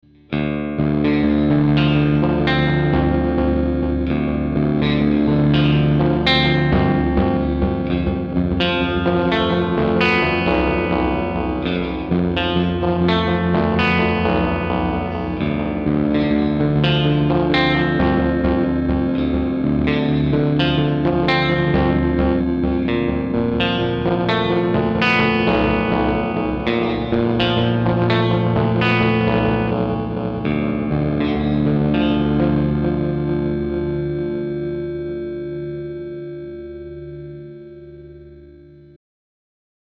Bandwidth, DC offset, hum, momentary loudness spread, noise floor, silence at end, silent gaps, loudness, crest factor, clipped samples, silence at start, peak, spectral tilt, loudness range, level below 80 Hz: 6.4 kHz; under 0.1%; none; 8 LU; -43 dBFS; 1.4 s; none; -18 LUFS; 16 dB; under 0.1%; 0.3 s; -2 dBFS; -8.5 dB/octave; 7 LU; -32 dBFS